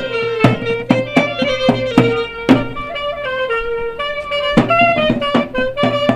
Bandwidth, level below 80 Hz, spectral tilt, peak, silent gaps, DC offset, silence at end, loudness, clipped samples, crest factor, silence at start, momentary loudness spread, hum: 11.5 kHz; -38 dBFS; -6.5 dB/octave; 0 dBFS; none; under 0.1%; 0 s; -16 LUFS; under 0.1%; 16 dB; 0 s; 8 LU; none